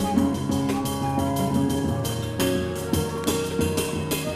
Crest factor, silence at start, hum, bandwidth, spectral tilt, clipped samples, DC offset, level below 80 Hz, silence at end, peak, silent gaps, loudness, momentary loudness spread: 16 dB; 0 s; none; 15.5 kHz; -5.5 dB/octave; under 0.1%; under 0.1%; -46 dBFS; 0 s; -8 dBFS; none; -25 LUFS; 3 LU